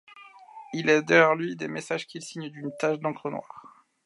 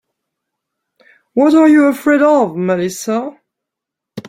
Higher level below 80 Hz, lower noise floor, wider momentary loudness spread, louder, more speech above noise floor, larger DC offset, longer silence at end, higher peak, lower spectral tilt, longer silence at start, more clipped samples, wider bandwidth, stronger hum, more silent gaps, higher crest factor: second, -78 dBFS vs -60 dBFS; second, -49 dBFS vs -82 dBFS; first, 17 LU vs 12 LU; second, -25 LUFS vs -13 LUFS; second, 23 dB vs 70 dB; neither; first, 0.4 s vs 0 s; about the same, -4 dBFS vs -2 dBFS; about the same, -5 dB/octave vs -6 dB/octave; second, 0.15 s vs 1.35 s; neither; second, 11.5 kHz vs 15.5 kHz; neither; neither; first, 22 dB vs 14 dB